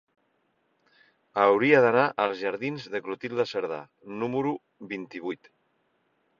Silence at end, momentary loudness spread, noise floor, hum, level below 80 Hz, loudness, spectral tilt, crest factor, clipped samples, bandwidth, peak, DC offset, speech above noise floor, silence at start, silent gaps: 1.05 s; 18 LU; -72 dBFS; none; -72 dBFS; -26 LUFS; -6.5 dB/octave; 22 dB; under 0.1%; 7.2 kHz; -6 dBFS; under 0.1%; 46 dB; 1.35 s; none